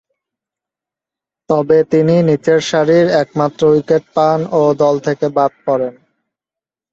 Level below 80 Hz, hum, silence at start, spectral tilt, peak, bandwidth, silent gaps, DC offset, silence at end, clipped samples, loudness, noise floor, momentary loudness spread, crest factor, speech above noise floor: -56 dBFS; none; 1.5 s; -6.5 dB/octave; 0 dBFS; 7.8 kHz; none; under 0.1%; 1 s; under 0.1%; -13 LUFS; -88 dBFS; 6 LU; 14 dB; 75 dB